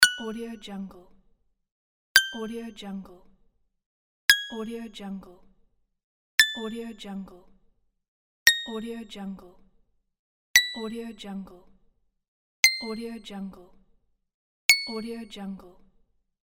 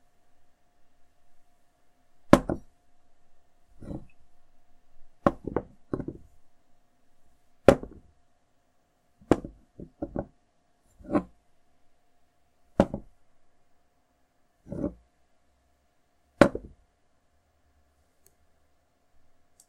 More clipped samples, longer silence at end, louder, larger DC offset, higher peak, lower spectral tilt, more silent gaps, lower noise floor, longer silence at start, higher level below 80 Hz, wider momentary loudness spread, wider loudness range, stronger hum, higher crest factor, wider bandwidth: neither; second, 0.7 s vs 3.1 s; first, -24 LUFS vs -27 LUFS; neither; about the same, 0 dBFS vs 0 dBFS; second, -1 dB/octave vs -7 dB/octave; first, 1.71-2.15 s, 3.86-4.28 s, 6.04-6.38 s, 8.08-8.46 s, 10.19-10.54 s, 12.28-12.63 s, 14.34-14.69 s vs none; about the same, -66 dBFS vs -68 dBFS; second, 0 s vs 1.3 s; second, -62 dBFS vs -50 dBFS; second, 19 LU vs 24 LU; second, 3 LU vs 7 LU; neither; about the same, 30 dB vs 32 dB; first, 17 kHz vs 15 kHz